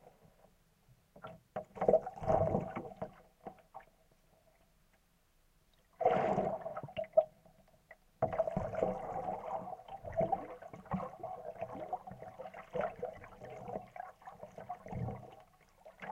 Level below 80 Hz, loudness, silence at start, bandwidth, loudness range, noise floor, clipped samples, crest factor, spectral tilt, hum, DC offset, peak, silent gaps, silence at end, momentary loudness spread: -62 dBFS; -38 LUFS; 0.05 s; 11 kHz; 8 LU; -71 dBFS; under 0.1%; 24 dB; -8 dB/octave; none; under 0.1%; -14 dBFS; none; 0 s; 20 LU